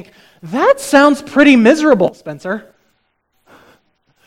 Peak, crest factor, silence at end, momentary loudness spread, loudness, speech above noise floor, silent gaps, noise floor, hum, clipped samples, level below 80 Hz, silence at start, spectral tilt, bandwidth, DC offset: 0 dBFS; 14 dB; 1.65 s; 16 LU; -12 LUFS; 52 dB; none; -64 dBFS; none; under 0.1%; -52 dBFS; 0.45 s; -5 dB/octave; 15 kHz; under 0.1%